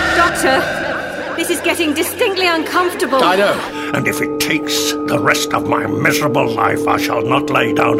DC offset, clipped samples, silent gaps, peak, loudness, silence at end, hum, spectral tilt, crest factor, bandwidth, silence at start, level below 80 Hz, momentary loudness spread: under 0.1%; under 0.1%; none; 0 dBFS; -15 LUFS; 0 s; none; -3.5 dB/octave; 14 dB; 16.5 kHz; 0 s; -44 dBFS; 6 LU